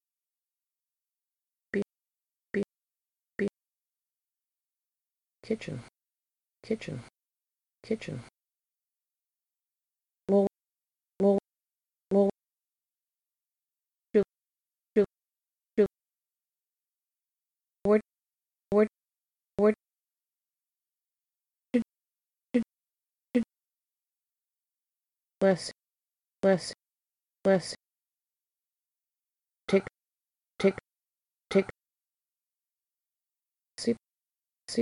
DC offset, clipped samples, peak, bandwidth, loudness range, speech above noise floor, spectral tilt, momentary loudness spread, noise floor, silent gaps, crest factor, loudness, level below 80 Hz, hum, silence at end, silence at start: under 0.1%; under 0.1%; -12 dBFS; 11.5 kHz; 10 LU; over 61 dB; -6.5 dB/octave; 15 LU; under -90 dBFS; none; 22 dB; -30 LUFS; -68 dBFS; none; 0 s; 1.75 s